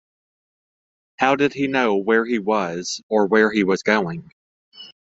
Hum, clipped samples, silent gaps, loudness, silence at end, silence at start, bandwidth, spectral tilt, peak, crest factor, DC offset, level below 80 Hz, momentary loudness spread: none; under 0.1%; 3.03-3.09 s, 4.32-4.72 s; -20 LUFS; 0.2 s; 1.2 s; 8 kHz; -5 dB/octave; -2 dBFS; 20 dB; under 0.1%; -62 dBFS; 8 LU